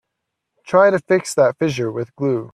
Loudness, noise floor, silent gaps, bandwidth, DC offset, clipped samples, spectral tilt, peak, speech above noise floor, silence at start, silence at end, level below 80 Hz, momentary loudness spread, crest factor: -18 LUFS; -78 dBFS; none; 13.5 kHz; under 0.1%; under 0.1%; -5.5 dB/octave; -2 dBFS; 61 dB; 0.65 s; 0.05 s; -62 dBFS; 9 LU; 18 dB